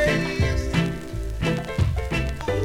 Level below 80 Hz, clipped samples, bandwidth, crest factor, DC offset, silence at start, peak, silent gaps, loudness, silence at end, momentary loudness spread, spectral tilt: -30 dBFS; under 0.1%; 16.5 kHz; 14 dB; under 0.1%; 0 s; -8 dBFS; none; -25 LUFS; 0 s; 5 LU; -6 dB/octave